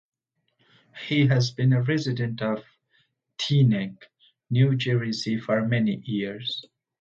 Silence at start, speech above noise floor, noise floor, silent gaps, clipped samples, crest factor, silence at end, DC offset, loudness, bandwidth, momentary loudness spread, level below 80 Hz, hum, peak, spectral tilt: 0.95 s; 49 dB; -72 dBFS; none; under 0.1%; 16 dB; 0.4 s; under 0.1%; -25 LUFS; 7.4 kHz; 11 LU; -64 dBFS; none; -10 dBFS; -6.5 dB/octave